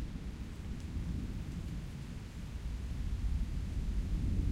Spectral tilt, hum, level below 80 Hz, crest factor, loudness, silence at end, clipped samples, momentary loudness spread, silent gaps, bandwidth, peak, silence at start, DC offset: -7 dB/octave; none; -38 dBFS; 16 dB; -41 LUFS; 0 s; under 0.1%; 8 LU; none; 12.5 kHz; -22 dBFS; 0 s; under 0.1%